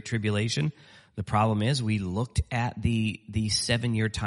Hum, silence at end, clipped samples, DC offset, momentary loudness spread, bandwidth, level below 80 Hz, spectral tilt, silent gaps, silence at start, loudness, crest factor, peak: none; 0 s; under 0.1%; under 0.1%; 6 LU; 11.5 kHz; -44 dBFS; -5 dB/octave; none; 0.05 s; -27 LUFS; 18 dB; -10 dBFS